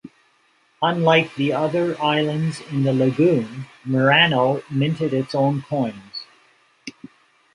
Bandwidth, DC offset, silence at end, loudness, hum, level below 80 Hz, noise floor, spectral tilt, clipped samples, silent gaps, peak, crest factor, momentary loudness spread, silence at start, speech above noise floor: 11 kHz; under 0.1%; 0.65 s; -20 LUFS; none; -64 dBFS; -61 dBFS; -6.5 dB/octave; under 0.1%; none; -2 dBFS; 18 dB; 18 LU; 0.05 s; 41 dB